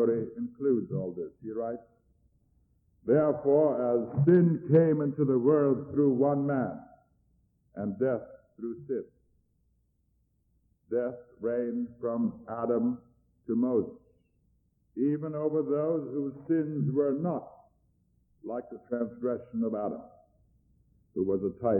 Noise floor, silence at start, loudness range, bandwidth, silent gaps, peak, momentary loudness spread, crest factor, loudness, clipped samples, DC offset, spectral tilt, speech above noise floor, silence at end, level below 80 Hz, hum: -72 dBFS; 0 s; 12 LU; 3 kHz; none; -12 dBFS; 15 LU; 18 dB; -29 LUFS; under 0.1%; under 0.1%; -13.5 dB/octave; 44 dB; 0 s; -68 dBFS; none